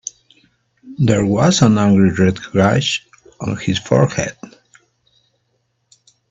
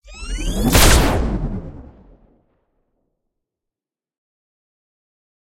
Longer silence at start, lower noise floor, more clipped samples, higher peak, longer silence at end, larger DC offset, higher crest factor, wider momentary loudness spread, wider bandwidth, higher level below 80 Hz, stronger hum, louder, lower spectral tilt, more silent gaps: first, 0.85 s vs 0.05 s; second, -67 dBFS vs -88 dBFS; neither; about the same, 0 dBFS vs 0 dBFS; second, 1.85 s vs 3.65 s; neither; about the same, 18 dB vs 20 dB; second, 13 LU vs 19 LU; second, 8 kHz vs 16.5 kHz; second, -50 dBFS vs -24 dBFS; neither; about the same, -15 LUFS vs -17 LUFS; first, -5.5 dB/octave vs -4 dB/octave; neither